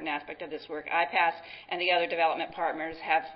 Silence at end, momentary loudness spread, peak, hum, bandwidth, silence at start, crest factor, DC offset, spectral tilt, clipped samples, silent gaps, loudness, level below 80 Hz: 0 s; 12 LU; -12 dBFS; none; 5.8 kHz; 0 s; 18 dB; under 0.1%; -7 dB/octave; under 0.1%; none; -29 LUFS; -68 dBFS